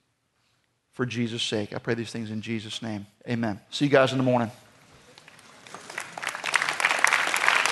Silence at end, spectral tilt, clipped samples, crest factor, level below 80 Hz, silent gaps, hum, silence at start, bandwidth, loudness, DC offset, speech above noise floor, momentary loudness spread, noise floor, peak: 0 s; -4 dB/octave; under 0.1%; 26 dB; -70 dBFS; none; none; 1 s; 12 kHz; -26 LUFS; under 0.1%; 44 dB; 15 LU; -71 dBFS; 0 dBFS